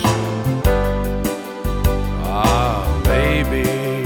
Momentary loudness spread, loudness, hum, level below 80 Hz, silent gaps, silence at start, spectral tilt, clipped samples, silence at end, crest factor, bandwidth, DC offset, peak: 6 LU; -19 LUFS; none; -22 dBFS; none; 0 s; -6 dB/octave; under 0.1%; 0 s; 16 dB; 19 kHz; under 0.1%; -2 dBFS